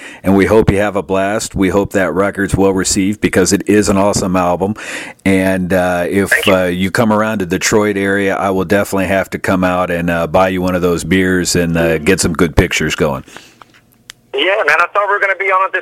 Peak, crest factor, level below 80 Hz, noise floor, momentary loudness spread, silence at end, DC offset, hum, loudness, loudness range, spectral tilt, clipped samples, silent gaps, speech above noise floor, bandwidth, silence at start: 0 dBFS; 14 dB; -34 dBFS; -45 dBFS; 5 LU; 0 s; under 0.1%; none; -13 LUFS; 2 LU; -4.5 dB/octave; under 0.1%; none; 32 dB; 16.5 kHz; 0 s